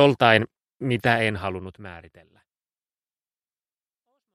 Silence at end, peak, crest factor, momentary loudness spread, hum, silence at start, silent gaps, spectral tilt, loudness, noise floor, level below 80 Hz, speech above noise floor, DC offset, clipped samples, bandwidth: 2.35 s; 0 dBFS; 24 dB; 22 LU; none; 0 s; none; -6.5 dB/octave; -22 LUFS; under -90 dBFS; -60 dBFS; over 68 dB; under 0.1%; under 0.1%; 13.5 kHz